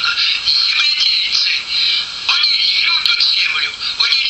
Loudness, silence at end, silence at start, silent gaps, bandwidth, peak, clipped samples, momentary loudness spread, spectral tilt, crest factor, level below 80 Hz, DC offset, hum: -12 LUFS; 0 s; 0 s; none; 8.4 kHz; 0 dBFS; under 0.1%; 4 LU; 2.5 dB/octave; 16 dB; -54 dBFS; under 0.1%; none